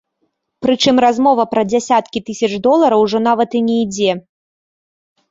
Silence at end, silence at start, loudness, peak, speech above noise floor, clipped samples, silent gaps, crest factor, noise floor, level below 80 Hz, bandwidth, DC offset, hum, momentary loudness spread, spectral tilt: 1.1 s; 0.6 s; -14 LUFS; -2 dBFS; 54 dB; under 0.1%; none; 14 dB; -68 dBFS; -56 dBFS; 7.8 kHz; under 0.1%; none; 8 LU; -4.5 dB/octave